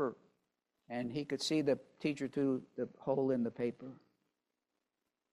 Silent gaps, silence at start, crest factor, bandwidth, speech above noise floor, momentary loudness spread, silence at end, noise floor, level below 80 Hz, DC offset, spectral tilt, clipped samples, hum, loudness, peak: none; 0 s; 18 dB; 13 kHz; 52 dB; 10 LU; 1.35 s; -88 dBFS; -76 dBFS; under 0.1%; -5.5 dB/octave; under 0.1%; none; -37 LUFS; -20 dBFS